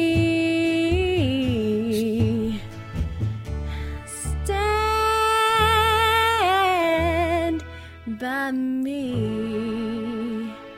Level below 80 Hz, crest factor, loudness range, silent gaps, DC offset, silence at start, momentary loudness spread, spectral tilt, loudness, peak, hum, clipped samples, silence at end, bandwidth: -36 dBFS; 16 dB; 7 LU; none; under 0.1%; 0 s; 13 LU; -5.5 dB/octave; -22 LUFS; -6 dBFS; none; under 0.1%; 0 s; 16.5 kHz